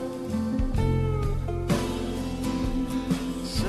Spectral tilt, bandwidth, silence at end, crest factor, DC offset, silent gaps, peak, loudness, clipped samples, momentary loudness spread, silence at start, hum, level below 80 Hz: -6.5 dB/octave; 13.5 kHz; 0 s; 14 dB; under 0.1%; none; -12 dBFS; -28 LUFS; under 0.1%; 4 LU; 0 s; none; -34 dBFS